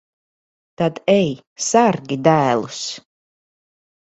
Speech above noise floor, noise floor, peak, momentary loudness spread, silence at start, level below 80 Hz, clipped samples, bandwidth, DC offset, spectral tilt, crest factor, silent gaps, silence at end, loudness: over 72 dB; under -90 dBFS; 0 dBFS; 11 LU; 0.8 s; -60 dBFS; under 0.1%; 8.4 kHz; under 0.1%; -5 dB/octave; 20 dB; 1.47-1.56 s; 1.05 s; -18 LUFS